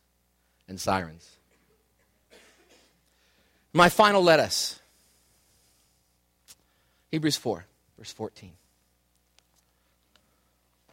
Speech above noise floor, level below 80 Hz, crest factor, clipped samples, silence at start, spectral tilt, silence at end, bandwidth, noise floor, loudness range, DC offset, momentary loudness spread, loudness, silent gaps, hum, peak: 46 dB; -64 dBFS; 26 dB; under 0.1%; 0.7 s; -4 dB/octave; 2.45 s; 16.5 kHz; -70 dBFS; 13 LU; under 0.1%; 25 LU; -24 LUFS; none; 60 Hz at -60 dBFS; -4 dBFS